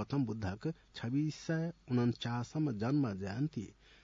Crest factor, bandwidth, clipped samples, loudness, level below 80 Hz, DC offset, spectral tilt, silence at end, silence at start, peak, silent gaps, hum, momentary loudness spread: 14 dB; 7.4 kHz; under 0.1%; -37 LUFS; -68 dBFS; under 0.1%; -7 dB/octave; 0.3 s; 0 s; -22 dBFS; none; none; 8 LU